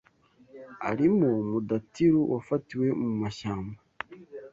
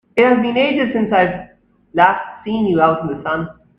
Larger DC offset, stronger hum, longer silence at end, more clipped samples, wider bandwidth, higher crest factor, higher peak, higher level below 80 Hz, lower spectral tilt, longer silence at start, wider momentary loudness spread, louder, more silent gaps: neither; neither; second, 0.05 s vs 0.25 s; neither; first, 7.6 kHz vs 5.6 kHz; about the same, 16 dB vs 16 dB; second, -12 dBFS vs 0 dBFS; second, -60 dBFS vs -52 dBFS; about the same, -8 dB/octave vs -8 dB/octave; first, 0.55 s vs 0.15 s; first, 18 LU vs 10 LU; second, -27 LUFS vs -16 LUFS; neither